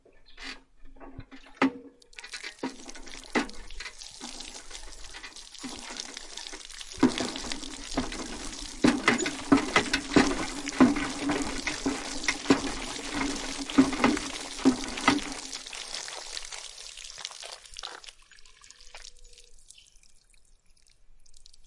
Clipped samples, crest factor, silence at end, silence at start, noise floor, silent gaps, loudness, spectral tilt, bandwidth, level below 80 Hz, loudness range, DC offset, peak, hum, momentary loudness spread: under 0.1%; 24 dB; 0 s; 0.3 s; -58 dBFS; none; -29 LUFS; -3 dB/octave; 11.5 kHz; -48 dBFS; 15 LU; under 0.1%; -6 dBFS; none; 20 LU